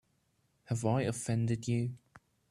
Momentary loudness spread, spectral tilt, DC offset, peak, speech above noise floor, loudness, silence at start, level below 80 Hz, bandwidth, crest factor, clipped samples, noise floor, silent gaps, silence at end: 8 LU; -6.5 dB/octave; under 0.1%; -16 dBFS; 43 dB; -34 LUFS; 0.7 s; -66 dBFS; 12.5 kHz; 18 dB; under 0.1%; -75 dBFS; none; 0.3 s